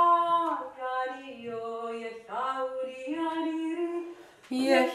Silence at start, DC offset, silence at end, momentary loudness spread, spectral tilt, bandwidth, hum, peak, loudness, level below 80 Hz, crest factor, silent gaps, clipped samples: 0 s; under 0.1%; 0 s; 14 LU; -3.5 dB/octave; 14 kHz; none; -10 dBFS; -31 LUFS; -78 dBFS; 20 dB; none; under 0.1%